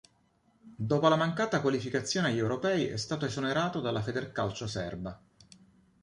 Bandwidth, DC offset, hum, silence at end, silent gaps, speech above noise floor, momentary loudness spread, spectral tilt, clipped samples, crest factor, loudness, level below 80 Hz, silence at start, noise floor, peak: 11.5 kHz; under 0.1%; none; 0.85 s; none; 39 dB; 10 LU; -5.5 dB/octave; under 0.1%; 20 dB; -31 LUFS; -60 dBFS; 0.65 s; -69 dBFS; -10 dBFS